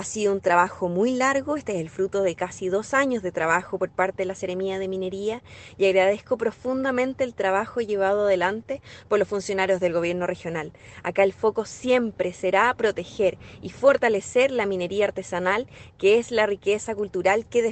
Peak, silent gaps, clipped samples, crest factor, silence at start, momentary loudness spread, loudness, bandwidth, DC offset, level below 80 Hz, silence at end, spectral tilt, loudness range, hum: -4 dBFS; none; under 0.1%; 20 dB; 0 s; 9 LU; -24 LUFS; 9 kHz; under 0.1%; -58 dBFS; 0 s; -4.5 dB/octave; 3 LU; none